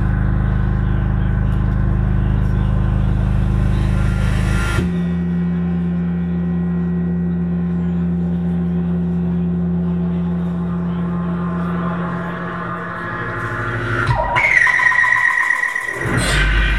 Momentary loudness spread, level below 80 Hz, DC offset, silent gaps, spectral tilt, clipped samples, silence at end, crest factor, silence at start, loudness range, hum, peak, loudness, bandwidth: 9 LU; -24 dBFS; 0.7%; none; -6.5 dB/octave; under 0.1%; 0 s; 16 dB; 0 s; 6 LU; none; 0 dBFS; -18 LUFS; 11.5 kHz